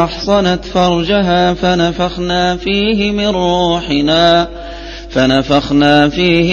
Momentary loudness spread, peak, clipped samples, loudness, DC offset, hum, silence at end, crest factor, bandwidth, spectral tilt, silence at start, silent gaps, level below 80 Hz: 5 LU; 0 dBFS; under 0.1%; -12 LUFS; under 0.1%; none; 0 s; 12 dB; 7.2 kHz; -5.5 dB/octave; 0 s; none; -30 dBFS